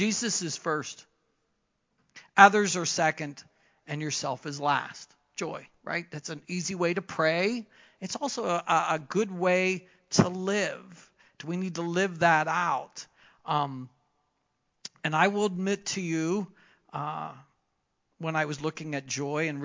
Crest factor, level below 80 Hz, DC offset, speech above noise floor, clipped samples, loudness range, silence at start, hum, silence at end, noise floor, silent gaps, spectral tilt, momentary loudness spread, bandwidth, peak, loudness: 28 dB; -68 dBFS; under 0.1%; 49 dB; under 0.1%; 7 LU; 0 s; none; 0 s; -77 dBFS; none; -4 dB/octave; 16 LU; 7.8 kHz; -2 dBFS; -28 LUFS